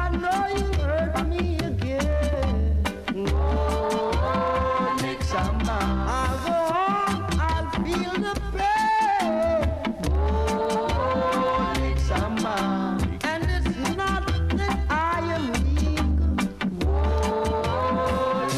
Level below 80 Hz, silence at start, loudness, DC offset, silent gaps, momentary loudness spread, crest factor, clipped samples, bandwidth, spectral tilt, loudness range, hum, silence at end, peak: -28 dBFS; 0 s; -24 LUFS; under 0.1%; none; 3 LU; 14 dB; under 0.1%; 13.5 kHz; -6 dB/octave; 1 LU; none; 0 s; -10 dBFS